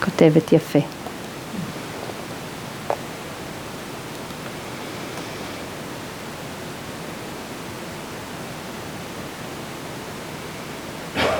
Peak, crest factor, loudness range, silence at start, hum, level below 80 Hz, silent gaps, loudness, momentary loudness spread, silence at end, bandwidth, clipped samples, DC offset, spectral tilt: 0 dBFS; 26 dB; 7 LU; 0 s; none; -54 dBFS; none; -27 LUFS; 12 LU; 0 s; over 20 kHz; under 0.1%; under 0.1%; -5.5 dB/octave